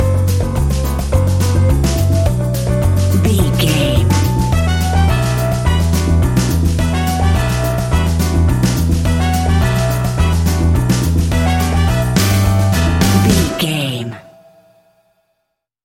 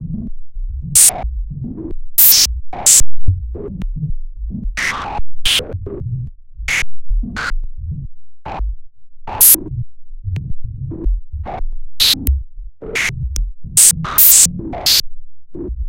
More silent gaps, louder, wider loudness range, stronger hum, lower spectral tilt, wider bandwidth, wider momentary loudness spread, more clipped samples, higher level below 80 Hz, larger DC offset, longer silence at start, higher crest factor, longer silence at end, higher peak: neither; about the same, -14 LUFS vs -12 LUFS; second, 1 LU vs 10 LU; neither; first, -6 dB/octave vs -1 dB/octave; second, 17 kHz vs over 20 kHz; second, 3 LU vs 22 LU; second, under 0.1% vs 0.2%; about the same, -20 dBFS vs -24 dBFS; neither; about the same, 0 s vs 0 s; about the same, 14 dB vs 14 dB; first, 1.65 s vs 0 s; about the same, 0 dBFS vs 0 dBFS